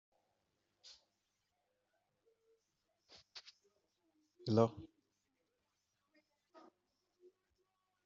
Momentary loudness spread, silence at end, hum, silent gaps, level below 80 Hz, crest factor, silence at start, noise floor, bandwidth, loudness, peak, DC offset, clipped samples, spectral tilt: 26 LU; 3.2 s; none; none; -82 dBFS; 30 dB; 3.35 s; -86 dBFS; 7.4 kHz; -37 LUFS; -16 dBFS; under 0.1%; under 0.1%; -7 dB/octave